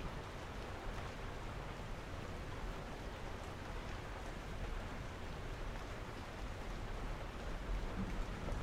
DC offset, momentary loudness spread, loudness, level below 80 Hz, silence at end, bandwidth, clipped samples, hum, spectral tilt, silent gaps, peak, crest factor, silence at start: under 0.1%; 3 LU; -47 LUFS; -48 dBFS; 0 s; 15.5 kHz; under 0.1%; none; -5.5 dB/octave; none; -30 dBFS; 14 dB; 0 s